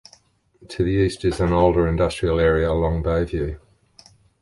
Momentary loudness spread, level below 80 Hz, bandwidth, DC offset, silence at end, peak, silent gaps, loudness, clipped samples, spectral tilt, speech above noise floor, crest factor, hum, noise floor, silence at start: 9 LU; -32 dBFS; 11.5 kHz; under 0.1%; 0.85 s; -2 dBFS; none; -21 LUFS; under 0.1%; -7 dB/octave; 36 dB; 18 dB; none; -56 dBFS; 0.6 s